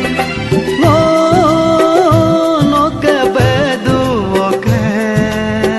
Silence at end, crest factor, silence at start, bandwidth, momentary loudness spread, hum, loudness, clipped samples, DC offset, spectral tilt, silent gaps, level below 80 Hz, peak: 0 s; 10 dB; 0 s; 12.5 kHz; 5 LU; none; -11 LUFS; under 0.1%; under 0.1%; -6.5 dB/octave; none; -34 dBFS; 0 dBFS